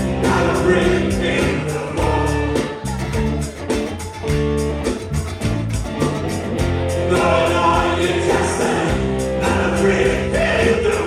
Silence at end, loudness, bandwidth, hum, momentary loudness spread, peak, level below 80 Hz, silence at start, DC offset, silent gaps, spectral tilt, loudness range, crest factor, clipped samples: 0 s; -18 LUFS; 14 kHz; none; 7 LU; -2 dBFS; -30 dBFS; 0 s; under 0.1%; none; -5.5 dB/octave; 5 LU; 16 dB; under 0.1%